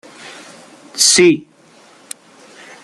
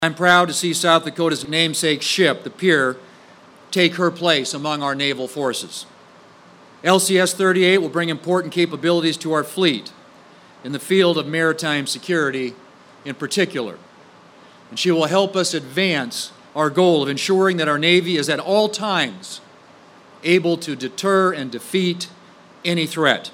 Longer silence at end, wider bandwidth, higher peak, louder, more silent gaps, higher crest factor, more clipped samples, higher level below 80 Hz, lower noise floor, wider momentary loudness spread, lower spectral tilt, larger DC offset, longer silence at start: first, 1.45 s vs 0.05 s; second, 14 kHz vs 16.5 kHz; about the same, 0 dBFS vs -2 dBFS; first, -11 LUFS vs -19 LUFS; neither; about the same, 18 dB vs 18 dB; neither; first, -62 dBFS vs -70 dBFS; about the same, -47 dBFS vs -47 dBFS; first, 26 LU vs 13 LU; second, -2 dB/octave vs -4 dB/octave; neither; first, 0.25 s vs 0 s